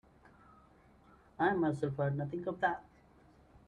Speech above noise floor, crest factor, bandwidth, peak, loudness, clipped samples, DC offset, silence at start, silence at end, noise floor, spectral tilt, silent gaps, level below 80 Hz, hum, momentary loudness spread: 29 dB; 20 dB; 10 kHz; -18 dBFS; -35 LUFS; under 0.1%; under 0.1%; 1.4 s; 0.85 s; -63 dBFS; -8.5 dB/octave; none; -68 dBFS; none; 7 LU